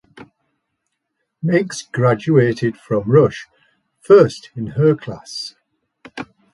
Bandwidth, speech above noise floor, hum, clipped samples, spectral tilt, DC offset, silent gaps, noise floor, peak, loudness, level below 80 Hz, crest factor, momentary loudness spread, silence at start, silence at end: 11.5 kHz; 59 dB; none; under 0.1%; -7 dB/octave; under 0.1%; none; -74 dBFS; 0 dBFS; -16 LUFS; -56 dBFS; 18 dB; 21 LU; 1.45 s; 0.3 s